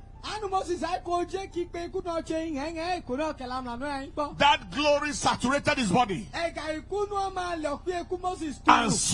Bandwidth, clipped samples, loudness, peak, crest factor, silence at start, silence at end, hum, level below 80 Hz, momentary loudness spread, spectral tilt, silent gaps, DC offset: 11.5 kHz; under 0.1%; -28 LUFS; -2 dBFS; 26 dB; 0 s; 0 s; none; -48 dBFS; 11 LU; -3.5 dB/octave; none; under 0.1%